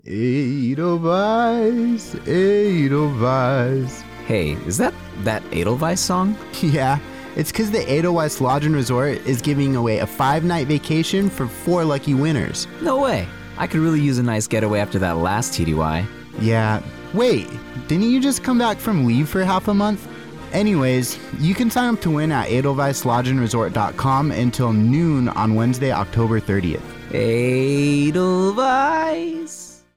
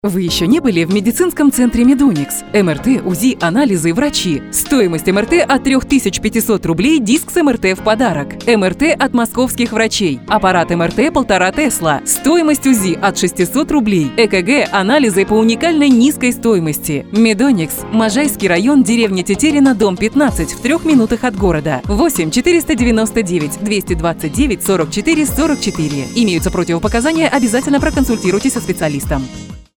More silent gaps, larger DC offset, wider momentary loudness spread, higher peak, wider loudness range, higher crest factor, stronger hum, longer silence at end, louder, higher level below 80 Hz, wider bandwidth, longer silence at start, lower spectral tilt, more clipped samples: neither; first, 0.3% vs under 0.1%; about the same, 7 LU vs 5 LU; second, -8 dBFS vs 0 dBFS; about the same, 2 LU vs 2 LU; about the same, 10 dB vs 12 dB; neither; about the same, 0.2 s vs 0.2 s; second, -19 LUFS vs -13 LUFS; second, -44 dBFS vs -32 dBFS; second, 17 kHz vs over 20 kHz; about the same, 0.05 s vs 0.05 s; first, -6 dB/octave vs -4.5 dB/octave; neither